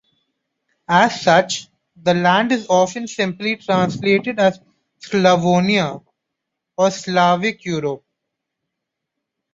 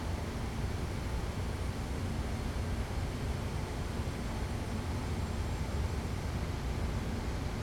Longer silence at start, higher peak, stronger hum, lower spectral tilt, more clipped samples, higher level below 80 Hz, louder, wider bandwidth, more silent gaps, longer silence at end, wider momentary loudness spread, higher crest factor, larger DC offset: first, 0.9 s vs 0 s; first, -2 dBFS vs -24 dBFS; neither; about the same, -5 dB/octave vs -6 dB/octave; neither; second, -60 dBFS vs -40 dBFS; first, -17 LUFS vs -37 LUFS; second, 7.8 kHz vs 17 kHz; neither; first, 1.55 s vs 0 s; first, 9 LU vs 1 LU; first, 18 dB vs 12 dB; neither